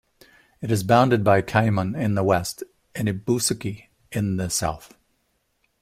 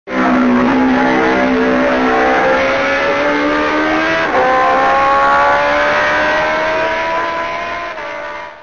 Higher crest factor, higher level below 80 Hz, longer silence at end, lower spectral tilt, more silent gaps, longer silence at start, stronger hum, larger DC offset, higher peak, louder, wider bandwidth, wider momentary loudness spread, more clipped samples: first, 20 dB vs 12 dB; second, -52 dBFS vs -40 dBFS; first, 0.95 s vs 0 s; about the same, -5 dB/octave vs -5 dB/octave; neither; first, 0.6 s vs 0.05 s; neither; second, under 0.1% vs 0.6%; about the same, -4 dBFS vs -2 dBFS; second, -22 LUFS vs -13 LUFS; first, 16 kHz vs 7.4 kHz; first, 16 LU vs 8 LU; neither